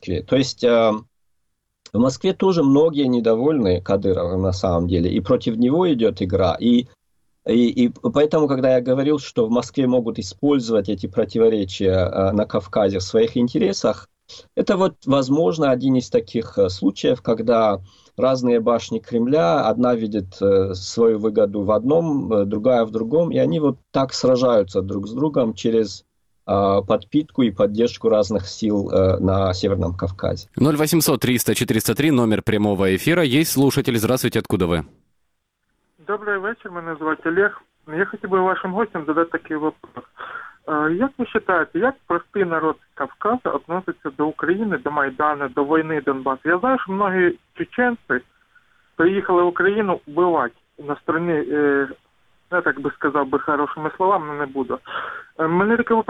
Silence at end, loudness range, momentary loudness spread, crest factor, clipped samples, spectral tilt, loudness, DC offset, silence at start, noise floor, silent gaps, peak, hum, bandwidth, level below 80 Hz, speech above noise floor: 0.05 s; 4 LU; 8 LU; 16 dB; under 0.1%; -6 dB/octave; -20 LUFS; under 0.1%; 0 s; -74 dBFS; none; -4 dBFS; none; 16.5 kHz; -50 dBFS; 55 dB